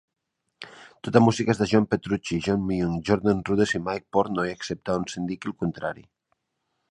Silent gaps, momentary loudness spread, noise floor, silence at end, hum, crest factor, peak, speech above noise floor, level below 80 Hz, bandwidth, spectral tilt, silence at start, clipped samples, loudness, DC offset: none; 14 LU; -78 dBFS; 1 s; none; 24 dB; -2 dBFS; 54 dB; -52 dBFS; 11 kHz; -6 dB/octave; 0.6 s; under 0.1%; -25 LUFS; under 0.1%